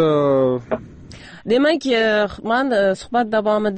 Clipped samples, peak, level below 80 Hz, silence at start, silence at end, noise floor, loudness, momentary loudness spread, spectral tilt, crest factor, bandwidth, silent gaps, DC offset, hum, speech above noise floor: under 0.1%; -6 dBFS; -50 dBFS; 0 s; 0 s; -39 dBFS; -18 LUFS; 11 LU; -6 dB/octave; 12 dB; 8.8 kHz; none; under 0.1%; none; 22 dB